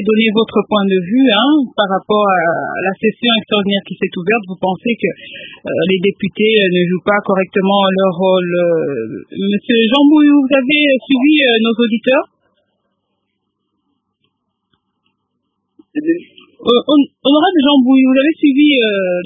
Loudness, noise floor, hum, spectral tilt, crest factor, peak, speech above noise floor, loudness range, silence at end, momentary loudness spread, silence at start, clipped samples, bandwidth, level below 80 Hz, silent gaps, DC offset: -13 LUFS; -70 dBFS; none; -8.5 dB/octave; 14 dB; 0 dBFS; 57 dB; 7 LU; 0 s; 10 LU; 0 s; under 0.1%; 3.9 kHz; -60 dBFS; none; under 0.1%